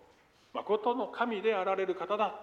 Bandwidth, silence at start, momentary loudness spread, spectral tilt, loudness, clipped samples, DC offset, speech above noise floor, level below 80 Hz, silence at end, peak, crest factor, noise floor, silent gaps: 7.2 kHz; 0.55 s; 5 LU; -6 dB/octave; -32 LUFS; under 0.1%; under 0.1%; 32 dB; -78 dBFS; 0 s; -16 dBFS; 18 dB; -63 dBFS; none